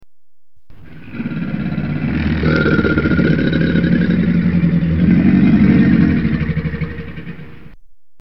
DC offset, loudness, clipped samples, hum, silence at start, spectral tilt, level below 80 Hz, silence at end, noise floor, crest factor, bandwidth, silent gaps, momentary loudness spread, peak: 2%; -15 LUFS; under 0.1%; none; 0 s; -10 dB/octave; -30 dBFS; 0.45 s; -63 dBFS; 14 dB; 5.8 kHz; none; 15 LU; 0 dBFS